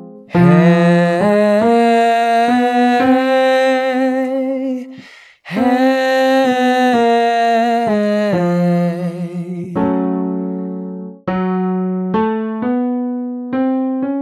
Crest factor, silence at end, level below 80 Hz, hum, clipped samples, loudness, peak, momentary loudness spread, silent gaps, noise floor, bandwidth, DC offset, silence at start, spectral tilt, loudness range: 14 dB; 0 s; -56 dBFS; none; under 0.1%; -15 LUFS; 0 dBFS; 11 LU; none; -40 dBFS; 13 kHz; under 0.1%; 0 s; -7 dB/octave; 7 LU